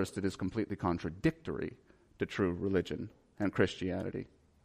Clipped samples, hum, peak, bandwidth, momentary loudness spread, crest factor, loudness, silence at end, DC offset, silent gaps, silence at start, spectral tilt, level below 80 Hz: under 0.1%; none; -14 dBFS; 15 kHz; 11 LU; 20 dB; -36 LUFS; 0.4 s; under 0.1%; none; 0 s; -6.5 dB/octave; -58 dBFS